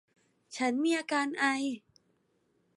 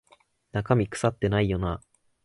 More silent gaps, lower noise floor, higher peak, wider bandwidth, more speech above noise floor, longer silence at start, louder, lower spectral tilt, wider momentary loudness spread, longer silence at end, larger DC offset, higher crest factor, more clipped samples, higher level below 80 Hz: neither; first, -73 dBFS vs -62 dBFS; second, -14 dBFS vs -6 dBFS; about the same, 11.5 kHz vs 11.5 kHz; first, 43 dB vs 37 dB; about the same, 0.5 s vs 0.55 s; second, -31 LUFS vs -27 LUFS; second, -2.5 dB/octave vs -6.5 dB/octave; first, 12 LU vs 9 LU; first, 1 s vs 0.45 s; neither; about the same, 20 dB vs 20 dB; neither; second, -88 dBFS vs -44 dBFS